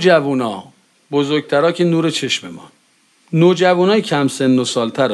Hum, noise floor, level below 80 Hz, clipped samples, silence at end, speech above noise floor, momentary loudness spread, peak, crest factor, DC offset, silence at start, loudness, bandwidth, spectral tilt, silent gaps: none; -56 dBFS; -66 dBFS; under 0.1%; 0 s; 41 dB; 9 LU; 0 dBFS; 16 dB; under 0.1%; 0 s; -16 LUFS; 12.5 kHz; -5.5 dB/octave; none